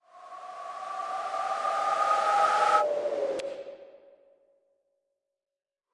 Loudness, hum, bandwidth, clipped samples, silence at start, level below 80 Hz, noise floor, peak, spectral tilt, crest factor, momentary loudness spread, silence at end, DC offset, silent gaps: -27 LUFS; none; 11.5 kHz; under 0.1%; 0.15 s; -80 dBFS; under -90 dBFS; -10 dBFS; -1.5 dB/octave; 20 dB; 19 LU; 2.05 s; under 0.1%; none